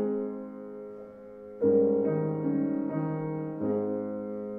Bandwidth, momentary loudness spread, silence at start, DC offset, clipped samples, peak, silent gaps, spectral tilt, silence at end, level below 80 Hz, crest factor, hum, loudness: 2.7 kHz; 19 LU; 0 s; under 0.1%; under 0.1%; -14 dBFS; none; -12.5 dB/octave; 0 s; -70 dBFS; 16 dB; none; -29 LUFS